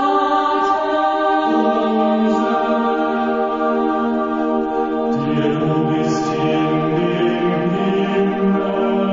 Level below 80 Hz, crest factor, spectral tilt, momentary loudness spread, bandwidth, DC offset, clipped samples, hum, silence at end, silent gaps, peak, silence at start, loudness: -52 dBFS; 12 dB; -7 dB/octave; 3 LU; 7.6 kHz; under 0.1%; under 0.1%; none; 0 s; none; -4 dBFS; 0 s; -18 LUFS